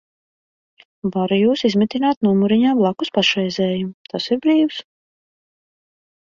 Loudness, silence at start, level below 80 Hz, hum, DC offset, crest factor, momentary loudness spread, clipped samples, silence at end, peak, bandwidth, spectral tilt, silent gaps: -18 LUFS; 1.05 s; -60 dBFS; none; under 0.1%; 16 dB; 10 LU; under 0.1%; 1.4 s; -2 dBFS; 7.4 kHz; -6 dB/octave; 2.17-2.21 s, 3.94-4.05 s